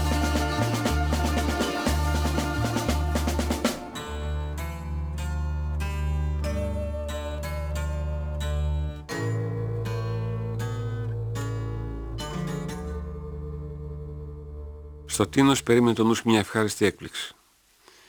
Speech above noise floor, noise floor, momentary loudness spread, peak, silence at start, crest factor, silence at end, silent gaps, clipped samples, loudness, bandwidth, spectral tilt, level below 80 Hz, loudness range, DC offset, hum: 38 dB; -61 dBFS; 14 LU; -6 dBFS; 0 s; 20 dB; 0.75 s; none; under 0.1%; -28 LUFS; over 20 kHz; -5.5 dB/octave; -32 dBFS; 9 LU; under 0.1%; none